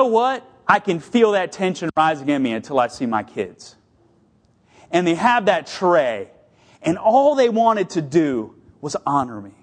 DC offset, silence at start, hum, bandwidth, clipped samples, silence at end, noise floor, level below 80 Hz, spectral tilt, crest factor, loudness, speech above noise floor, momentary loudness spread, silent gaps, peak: under 0.1%; 0 s; none; 10 kHz; under 0.1%; 0.1 s; -58 dBFS; -62 dBFS; -5.5 dB/octave; 20 dB; -19 LUFS; 39 dB; 13 LU; none; 0 dBFS